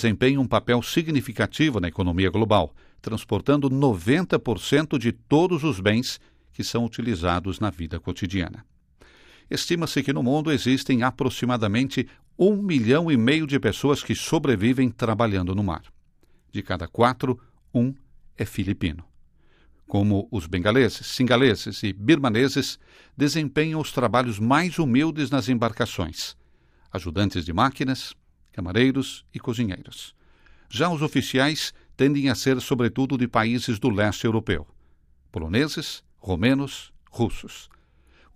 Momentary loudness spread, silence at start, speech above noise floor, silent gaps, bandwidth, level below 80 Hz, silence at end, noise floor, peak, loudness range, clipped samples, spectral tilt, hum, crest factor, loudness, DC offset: 12 LU; 0 s; 35 dB; none; 15.5 kHz; -50 dBFS; 0.7 s; -58 dBFS; -4 dBFS; 5 LU; under 0.1%; -6 dB/octave; none; 20 dB; -23 LUFS; under 0.1%